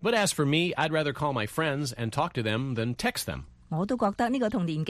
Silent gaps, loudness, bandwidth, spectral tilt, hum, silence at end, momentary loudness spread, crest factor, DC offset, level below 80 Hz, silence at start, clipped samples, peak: none; -28 LUFS; 15 kHz; -5 dB/octave; none; 0 s; 7 LU; 16 dB; under 0.1%; -54 dBFS; 0 s; under 0.1%; -12 dBFS